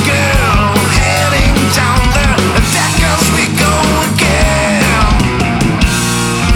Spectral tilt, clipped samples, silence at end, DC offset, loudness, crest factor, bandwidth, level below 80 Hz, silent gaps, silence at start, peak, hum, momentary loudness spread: -4 dB/octave; under 0.1%; 0 s; under 0.1%; -10 LUFS; 10 dB; 18.5 kHz; -18 dBFS; none; 0 s; 0 dBFS; none; 2 LU